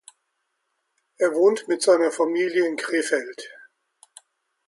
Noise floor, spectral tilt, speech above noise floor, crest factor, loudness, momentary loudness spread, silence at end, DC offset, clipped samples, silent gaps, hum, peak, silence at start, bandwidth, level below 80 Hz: -76 dBFS; -3 dB/octave; 54 dB; 18 dB; -22 LUFS; 13 LU; 1.15 s; under 0.1%; under 0.1%; none; none; -6 dBFS; 1.2 s; 11.5 kHz; -78 dBFS